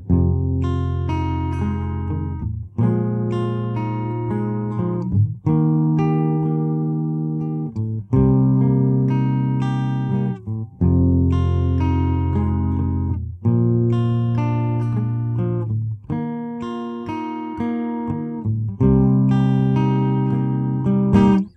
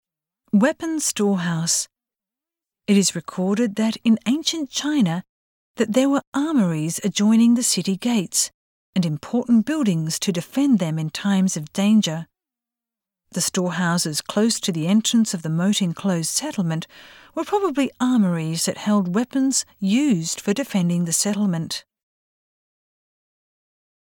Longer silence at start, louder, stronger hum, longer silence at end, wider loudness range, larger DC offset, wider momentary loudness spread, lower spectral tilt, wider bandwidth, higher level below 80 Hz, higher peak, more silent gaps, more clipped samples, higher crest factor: second, 0 s vs 0.55 s; about the same, -20 LUFS vs -21 LUFS; neither; second, 0.05 s vs 2.25 s; about the same, 4 LU vs 3 LU; neither; about the same, 9 LU vs 7 LU; first, -10.5 dB/octave vs -4.5 dB/octave; second, 6 kHz vs 18.5 kHz; first, -36 dBFS vs -66 dBFS; about the same, -4 dBFS vs -6 dBFS; second, none vs 5.29-5.75 s, 6.27-6.32 s, 8.54-8.93 s; neither; about the same, 16 dB vs 16 dB